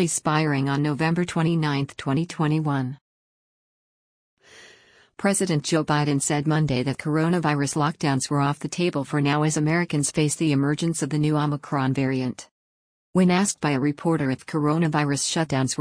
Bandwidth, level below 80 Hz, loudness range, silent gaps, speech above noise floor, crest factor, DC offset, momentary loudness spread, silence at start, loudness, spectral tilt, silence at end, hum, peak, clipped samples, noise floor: 10.5 kHz; -58 dBFS; 5 LU; 3.01-4.37 s, 12.51-13.13 s; 32 dB; 16 dB; under 0.1%; 4 LU; 0 s; -23 LUFS; -5 dB/octave; 0.05 s; none; -8 dBFS; under 0.1%; -54 dBFS